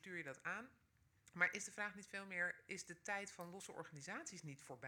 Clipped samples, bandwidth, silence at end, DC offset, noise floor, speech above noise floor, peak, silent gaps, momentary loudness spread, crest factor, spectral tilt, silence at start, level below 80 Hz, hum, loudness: under 0.1%; 19 kHz; 0 s; under 0.1%; -74 dBFS; 25 dB; -22 dBFS; none; 14 LU; 26 dB; -3 dB/octave; 0.05 s; -86 dBFS; none; -47 LUFS